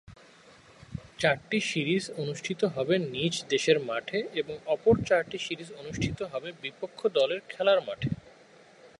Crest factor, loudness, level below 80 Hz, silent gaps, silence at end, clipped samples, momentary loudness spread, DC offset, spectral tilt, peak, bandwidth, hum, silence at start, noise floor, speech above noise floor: 22 dB; -29 LUFS; -56 dBFS; none; 0.15 s; under 0.1%; 13 LU; under 0.1%; -4.5 dB/octave; -8 dBFS; 11.5 kHz; none; 0.1 s; -56 dBFS; 27 dB